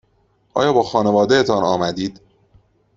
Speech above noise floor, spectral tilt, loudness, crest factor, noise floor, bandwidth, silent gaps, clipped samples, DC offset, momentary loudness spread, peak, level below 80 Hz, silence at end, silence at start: 44 dB; -5.5 dB/octave; -17 LUFS; 16 dB; -61 dBFS; 7.8 kHz; none; under 0.1%; under 0.1%; 11 LU; -2 dBFS; -54 dBFS; 0.85 s; 0.55 s